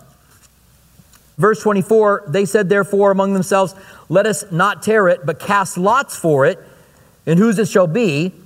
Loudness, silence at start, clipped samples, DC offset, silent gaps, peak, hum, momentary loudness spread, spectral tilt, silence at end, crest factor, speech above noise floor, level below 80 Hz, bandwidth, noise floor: -15 LUFS; 1.4 s; under 0.1%; under 0.1%; none; 0 dBFS; none; 4 LU; -5.5 dB/octave; 0.15 s; 16 dB; 36 dB; -58 dBFS; 16 kHz; -51 dBFS